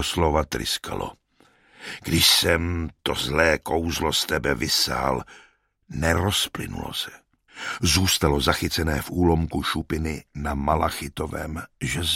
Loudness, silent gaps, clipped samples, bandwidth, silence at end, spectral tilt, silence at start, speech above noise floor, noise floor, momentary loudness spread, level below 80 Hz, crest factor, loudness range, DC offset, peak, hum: -23 LUFS; none; under 0.1%; 16.5 kHz; 0 s; -3.5 dB/octave; 0 s; 35 dB; -59 dBFS; 13 LU; -36 dBFS; 22 dB; 4 LU; under 0.1%; -4 dBFS; none